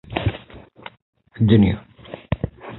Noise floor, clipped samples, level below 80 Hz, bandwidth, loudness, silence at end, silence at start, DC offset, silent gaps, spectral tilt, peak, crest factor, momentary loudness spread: -43 dBFS; under 0.1%; -38 dBFS; 4.2 kHz; -20 LUFS; 0 s; 0.1 s; under 0.1%; 1.02-1.13 s; -12 dB/octave; -2 dBFS; 20 dB; 26 LU